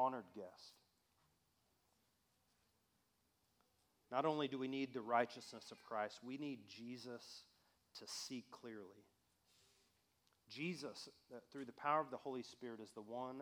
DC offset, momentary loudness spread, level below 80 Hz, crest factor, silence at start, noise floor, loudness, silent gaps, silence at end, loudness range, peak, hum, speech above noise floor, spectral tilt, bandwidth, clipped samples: under 0.1%; 17 LU; under -90 dBFS; 24 dB; 0 s; -82 dBFS; -46 LUFS; none; 0 s; 11 LU; -24 dBFS; none; 36 dB; -4.5 dB/octave; over 20 kHz; under 0.1%